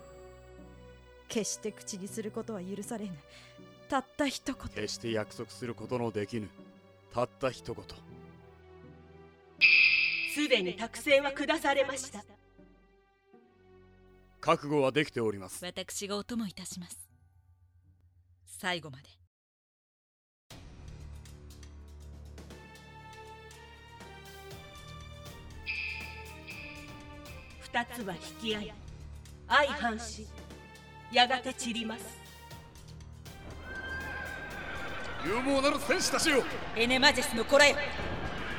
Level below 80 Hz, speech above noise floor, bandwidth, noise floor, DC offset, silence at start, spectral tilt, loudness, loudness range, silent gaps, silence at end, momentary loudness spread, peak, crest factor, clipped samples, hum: -54 dBFS; 34 dB; 19.5 kHz; -66 dBFS; under 0.1%; 0 s; -3 dB/octave; -30 LUFS; 22 LU; 19.27-20.50 s; 0 s; 24 LU; -8 dBFS; 26 dB; under 0.1%; none